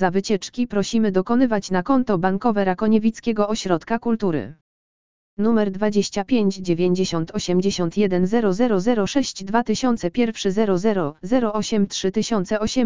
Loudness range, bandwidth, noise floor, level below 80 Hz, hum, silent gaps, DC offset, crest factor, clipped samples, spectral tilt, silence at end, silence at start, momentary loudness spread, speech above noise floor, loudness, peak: 2 LU; 7.6 kHz; under -90 dBFS; -50 dBFS; none; 4.61-5.37 s; 2%; 16 dB; under 0.1%; -5.5 dB/octave; 0 s; 0 s; 4 LU; over 70 dB; -21 LUFS; -4 dBFS